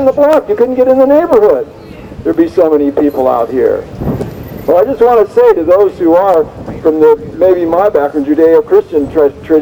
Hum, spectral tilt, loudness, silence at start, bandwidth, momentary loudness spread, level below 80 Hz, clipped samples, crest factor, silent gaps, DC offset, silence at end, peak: none; -8 dB/octave; -10 LUFS; 0 s; 16 kHz; 10 LU; -36 dBFS; 0.7%; 10 dB; none; under 0.1%; 0 s; 0 dBFS